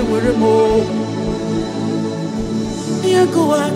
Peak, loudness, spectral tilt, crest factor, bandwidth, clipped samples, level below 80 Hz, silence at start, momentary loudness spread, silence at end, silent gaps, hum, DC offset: -2 dBFS; -17 LUFS; -6 dB/octave; 14 dB; 15.5 kHz; under 0.1%; -38 dBFS; 0 s; 8 LU; 0 s; none; none; under 0.1%